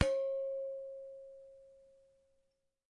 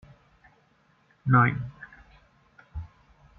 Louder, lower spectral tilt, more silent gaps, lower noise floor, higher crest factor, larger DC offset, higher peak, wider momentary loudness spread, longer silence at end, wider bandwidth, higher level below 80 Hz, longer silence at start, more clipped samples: second, -40 LUFS vs -24 LUFS; second, -6 dB/octave vs -10 dB/octave; neither; first, -80 dBFS vs -64 dBFS; about the same, 28 dB vs 24 dB; neither; second, -12 dBFS vs -8 dBFS; second, 22 LU vs 26 LU; first, 1.1 s vs 0.5 s; first, 10.5 kHz vs 3.7 kHz; second, -58 dBFS vs -52 dBFS; second, 0 s vs 1.25 s; neither